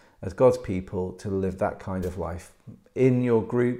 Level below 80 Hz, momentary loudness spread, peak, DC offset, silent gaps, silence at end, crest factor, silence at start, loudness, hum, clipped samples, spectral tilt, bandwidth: -52 dBFS; 13 LU; -8 dBFS; under 0.1%; none; 0 s; 18 dB; 0.2 s; -26 LUFS; none; under 0.1%; -8.5 dB/octave; 15 kHz